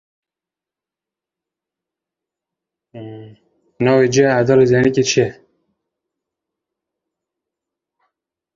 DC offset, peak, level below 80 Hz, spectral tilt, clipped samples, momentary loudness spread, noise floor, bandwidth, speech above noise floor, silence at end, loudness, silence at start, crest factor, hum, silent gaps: under 0.1%; -2 dBFS; -56 dBFS; -5.5 dB/octave; under 0.1%; 22 LU; -88 dBFS; 7.6 kHz; 74 dB; 3.25 s; -14 LUFS; 2.95 s; 18 dB; none; none